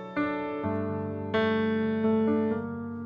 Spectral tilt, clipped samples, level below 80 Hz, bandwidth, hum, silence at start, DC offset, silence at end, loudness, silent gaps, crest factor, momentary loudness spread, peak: -9 dB/octave; under 0.1%; -62 dBFS; 5.6 kHz; none; 0 s; under 0.1%; 0 s; -28 LUFS; none; 12 dB; 7 LU; -16 dBFS